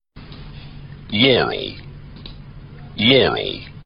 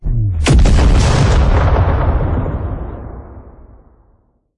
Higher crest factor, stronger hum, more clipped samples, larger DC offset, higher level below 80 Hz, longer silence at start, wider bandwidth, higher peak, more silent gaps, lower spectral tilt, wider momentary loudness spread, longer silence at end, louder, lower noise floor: first, 20 dB vs 12 dB; neither; neither; neither; second, -42 dBFS vs -16 dBFS; first, 0.15 s vs 0 s; second, 5.6 kHz vs 11 kHz; about the same, -2 dBFS vs 0 dBFS; neither; first, -9 dB/octave vs -6 dB/octave; first, 25 LU vs 17 LU; second, 0.05 s vs 1.1 s; second, -17 LUFS vs -14 LUFS; second, -38 dBFS vs -55 dBFS